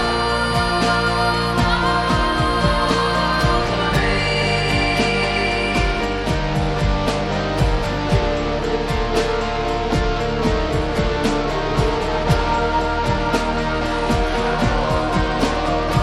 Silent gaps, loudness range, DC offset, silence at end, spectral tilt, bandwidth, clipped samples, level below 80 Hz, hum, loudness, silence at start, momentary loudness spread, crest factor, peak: none; 3 LU; under 0.1%; 0 s; -5.5 dB/octave; 13 kHz; under 0.1%; -26 dBFS; none; -19 LUFS; 0 s; 4 LU; 14 dB; -4 dBFS